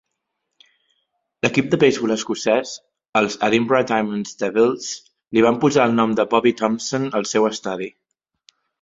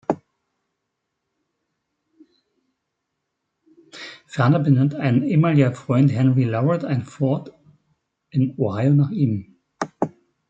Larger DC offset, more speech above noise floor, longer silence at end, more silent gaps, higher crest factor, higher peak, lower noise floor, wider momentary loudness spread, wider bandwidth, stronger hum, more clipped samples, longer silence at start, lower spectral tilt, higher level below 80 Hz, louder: neither; about the same, 58 dB vs 60 dB; first, 0.9 s vs 0.4 s; first, 3.09-3.13 s vs none; about the same, 18 dB vs 18 dB; about the same, -2 dBFS vs -4 dBFS; about the same, -77 dBFS vs -78 dBFS; about the same, 11 LU vs 13 LU; about the same, 7.8 kHz vs 7.8 kHz; neither; neither; first, 1.45 s vs 0.1 s; second, -4.5 dB/octave vs -9 dB/octave; about the same, -60 dBFS vs -64 dBFS; about the same, -19 LUFS vs -20 LUFS